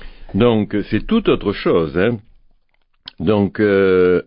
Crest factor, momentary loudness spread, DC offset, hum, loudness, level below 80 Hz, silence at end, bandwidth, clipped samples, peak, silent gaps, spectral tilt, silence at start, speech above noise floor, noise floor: 16 dB; 8 LU; under 0.1%; none; -17 LUFS; -38 dBFS; 0.05 s; 5.4 kHz; under 0.1%; -2 dBFS; none; -12 dB/octave; 0 s; 44 dB; -59 dBFS